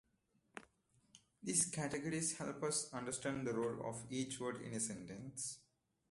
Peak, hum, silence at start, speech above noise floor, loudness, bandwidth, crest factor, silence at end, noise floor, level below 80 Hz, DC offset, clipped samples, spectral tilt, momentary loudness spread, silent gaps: -20 dBFS; none; 0.55 s; 38 dB; -41 LUFS; 12 kHz; 24 dB; 0.5 s; -80 dBFS; -74 dBFS; under 0.1%; under 0.1%; -3.5 dB/octave; 14 LU; none